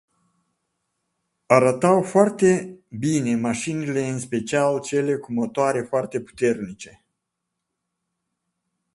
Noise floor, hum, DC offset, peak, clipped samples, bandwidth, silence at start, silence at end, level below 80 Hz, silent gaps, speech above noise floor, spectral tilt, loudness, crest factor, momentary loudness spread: -81 dBFS; none; under 0.1%; 0 dBFS; under 0.1%; 11.5 kHz; 1.5 s; 2.05 s; -62 dBFS; none; 60 dB; -6 dB/octave; -22 LUFS; 22 dB; 11 LU